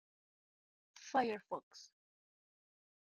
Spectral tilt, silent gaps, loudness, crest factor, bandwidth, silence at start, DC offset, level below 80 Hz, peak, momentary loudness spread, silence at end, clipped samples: -4 dB/octave; 1.63-1.71 s; -40 LUFS; 24 dB; 10 kHz; 0.95 s; under 0.1%; -88 dBFS; -22 dBFS; 21 LU; 1.3 s; under 0.1%